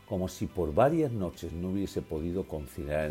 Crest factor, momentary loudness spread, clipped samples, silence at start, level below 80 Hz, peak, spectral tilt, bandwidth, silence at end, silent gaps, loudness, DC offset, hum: 20 dB; 11 LU; under 0.1%; 0.1 s; -48 dBFS; -12 dBFS; -7 dB/octave; 16 kHz; 0 s; none; -32 LUFS; under 0.1%; none